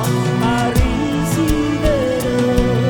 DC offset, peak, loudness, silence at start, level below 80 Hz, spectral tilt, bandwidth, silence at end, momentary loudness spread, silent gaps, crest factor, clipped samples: under 0.1%; 0 dBFS; -17 LUFS; 0 s; -24 dBFS; -6 dB/octave; 19.5 kHz; 0 s; 2 LU; none; 14 dB; under 0.1%